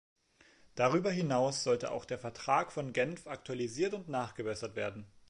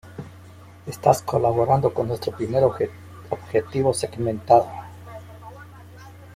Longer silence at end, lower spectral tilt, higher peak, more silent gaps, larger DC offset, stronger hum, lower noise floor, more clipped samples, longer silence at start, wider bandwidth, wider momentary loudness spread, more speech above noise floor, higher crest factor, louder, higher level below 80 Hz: first, 0.2 s vs 0 s; second, -5 dB/octave vs -6.5 dB/octave; second, -16 dBFS vs -2 dBFS; neither; neither; second, none vs 60 Hz at -55 dBFS; first, -65 dBFS vs -45 dBFS; neither; first, 0.75 s vs 0.05 s; second, 11 kHz vs 16 kHz; second, 9 LU vs 23 LU; first, 30 dB vs 24 dB; about the same, 20 dB vs 22 dB; second, -35 LUFS vs -22 LUFS; second, -68 dBFS vs -54 dBFS